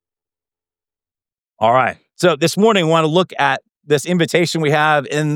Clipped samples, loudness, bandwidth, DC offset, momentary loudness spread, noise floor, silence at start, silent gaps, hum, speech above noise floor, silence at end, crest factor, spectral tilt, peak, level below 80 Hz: under 0.1%; -16 LUFS; 17.5 kHz; under 0.1%; 5 LU; under -90 dBFS; 1.6 s; none; none; over 75 dB; 0 s; 16 dB; -5 dB/octave; -2 dBFS; -68 dBFS